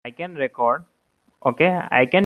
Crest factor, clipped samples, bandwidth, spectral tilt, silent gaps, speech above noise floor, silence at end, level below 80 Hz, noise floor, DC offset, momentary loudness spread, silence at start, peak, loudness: 20 dB; under 0.1%; 12 kHz; -7.5 dB/octave; none; 35 dB; 0 s; -66 dBFS; -55 dBFS; under 0.1%; 10 LU; 0.05 s; -2 dBFS; -21 LUFS